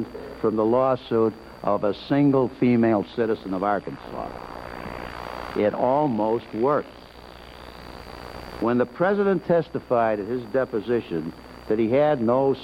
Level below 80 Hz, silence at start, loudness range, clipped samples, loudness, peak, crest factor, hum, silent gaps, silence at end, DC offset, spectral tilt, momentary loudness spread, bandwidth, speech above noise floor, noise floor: -50 dBFS; 0 s; 4 LU; under 0.1%; -23 LUFS; -8 dBFS; 16 dB; none; none; 0 s; under 0.1%; -8.5 dB/octave; 19 LU; 15.5 kHz; 21 dB; -44 dBFS